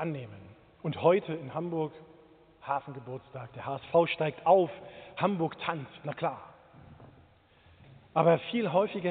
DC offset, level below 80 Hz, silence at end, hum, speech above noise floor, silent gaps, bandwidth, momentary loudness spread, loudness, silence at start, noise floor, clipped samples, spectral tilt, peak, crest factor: under 0.1%; -70 dBFS; 0 s; none; 31 dB; none; 4.5 kHz; 18 LU; -30 LUFS; 0 s; -61 dBFS; under 0.1%; -5 dB/octave; -10 dBFS; 22 dB